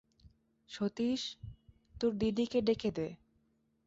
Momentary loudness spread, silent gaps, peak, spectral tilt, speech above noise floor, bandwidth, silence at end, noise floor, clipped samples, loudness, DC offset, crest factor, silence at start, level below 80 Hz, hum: 16 LU; none; -20 dBFS; -6 dB/octave; 41 dB; 7.8 kHz; 0.7 s; -75 dBFS; under 0.1%; -35 LUFS; under 0.1%; 18 dB; 0.25 s; -60 dBFS; none